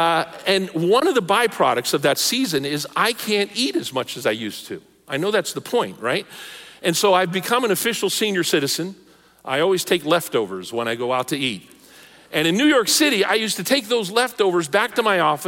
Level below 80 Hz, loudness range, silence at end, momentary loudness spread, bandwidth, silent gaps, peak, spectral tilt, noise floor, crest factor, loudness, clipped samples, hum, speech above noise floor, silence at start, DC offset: -66 dBFS; 4 LU; 0 s; 9 LU; 17 kHz; none; -4 dBFS; -3 dB/octave; -47 dBFS; 16 dB; -20 LUFS; under 0.1%; none; 27 dB; 0 s; under 0.1%